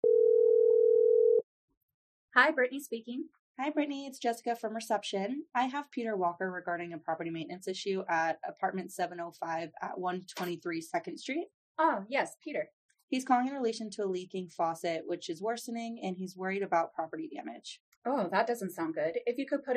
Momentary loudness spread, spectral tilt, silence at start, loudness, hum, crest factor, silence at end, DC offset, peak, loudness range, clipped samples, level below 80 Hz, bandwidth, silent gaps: 14 LU; -4.5 dB/octave; 0.05 s; -32 LUFS; none; 24 dB; 0 s; under 0.1%; -8 dBFS; 6 LU; under 0.1%; -86 dBFS; 14.5 kHz; 1.43-1.68 s, 1.77-2.28 s, 3.39-3.55 s, 11.54-11.75 s, 12.73-12.89 s, 13.03-13.08 s, 17.80-18.02 s